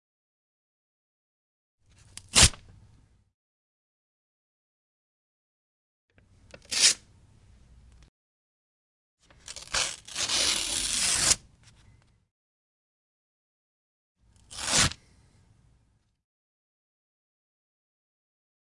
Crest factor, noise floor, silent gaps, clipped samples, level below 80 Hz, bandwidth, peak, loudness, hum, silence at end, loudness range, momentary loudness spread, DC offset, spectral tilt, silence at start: 30 dB; -69 dBFS; 3.34-6.08 s, 8.08-9.18 s, 12.31-14.15 s; under 0.1%; -48 dBFS; 11.5 kHz; -2 dBFS; -24 LUFS; none; 3.85 s; 5 LU; 16 LU; under 0.1%; -0.5 dB/octave; 2.35 s